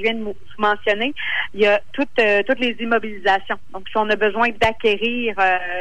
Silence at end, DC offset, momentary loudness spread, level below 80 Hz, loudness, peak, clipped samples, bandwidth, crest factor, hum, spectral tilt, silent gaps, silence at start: 0 s; 3%; 6 LU; -48 dBFS; -19 LUFS; -6 dBFS; under 0.1%; 10.5 kHz; 14 dB; none; -5 dB/octave; none; 0 s